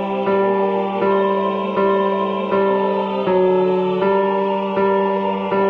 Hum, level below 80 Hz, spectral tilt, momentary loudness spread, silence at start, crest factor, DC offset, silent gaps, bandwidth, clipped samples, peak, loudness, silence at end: none; -58 dBFS; -8.5 dB/octave; 3 LU; 0 s; 12 dB; under 0.1%; none; 5 kHz; under 0.1%; -6 dBFS; -18 LUFS; 0 s